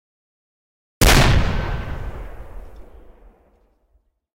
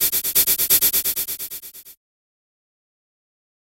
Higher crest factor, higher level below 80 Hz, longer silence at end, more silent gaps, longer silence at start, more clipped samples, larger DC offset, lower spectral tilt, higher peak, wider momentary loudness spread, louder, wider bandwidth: about the same, 16 dB vs 20 dB; first, -26 dBFS vs -54 dBFS; second, 0.05 s vs 1.75 s; neither; first, 1 s vs 0 s; neither; neither; first, -4 dB/octave vs 1 dB/octave; about the same, -4 dBFS vs -2 dBFS; first, 25 LU vs 17 LU; about the same, -18 LUFS vs -17 LUFS; about the same, 16 kHz vs 17 kHz